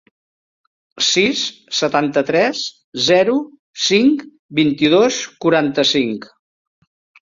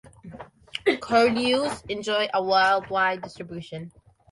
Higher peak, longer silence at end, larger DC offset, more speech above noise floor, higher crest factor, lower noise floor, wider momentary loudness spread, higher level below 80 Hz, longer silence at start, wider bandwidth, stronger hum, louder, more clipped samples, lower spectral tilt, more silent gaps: first, 0 dBFS vs -8 dBFS; first, 0.95 s vs 0.45 s; neither; first, over 74 dB vs 20 dB; about the same, 16 dB vs 18 dB; first, under -90 dBFS vs -44 dBFS; second, 10 LU vs 20 LU; about the same, -60 dBFS vs -58 dBFS; first, 0.95 s vs 0.25 s; second, 7.8 kHz vs 11.5 kHz; neither; first, -16 LUFS vs -23 LUFS; neither; about the same, -3.5 dB/octave vs -4 dB/octave; first, 2.84-2.92 s, 3.59-3.74 s, 4.39-4.49 s vs none